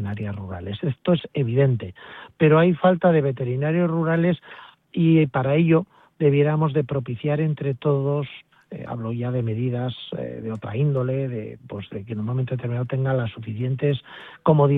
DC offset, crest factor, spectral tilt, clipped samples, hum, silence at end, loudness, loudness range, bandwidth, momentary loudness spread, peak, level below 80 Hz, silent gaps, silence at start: under 0.1%; 18 dB; -11 dB/octave; under 0.1%; none; 0 s; -23 LUFS; 6 LU; 4 kHz; 15 LU; -4 dBFS; -58 dBFS; none; 0 s